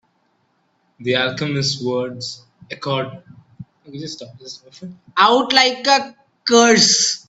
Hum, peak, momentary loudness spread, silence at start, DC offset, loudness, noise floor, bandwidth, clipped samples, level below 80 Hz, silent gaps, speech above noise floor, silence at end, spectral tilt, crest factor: none; 0 dBFS; 24 LU; 1 s; under 0.1%; -16 LUFS; -64 dBFS; 8.4 kHz; under 0.1%; -62 dBFS; none; 46 dB; 0.1 s; -2.5 dB/octave; 20 dB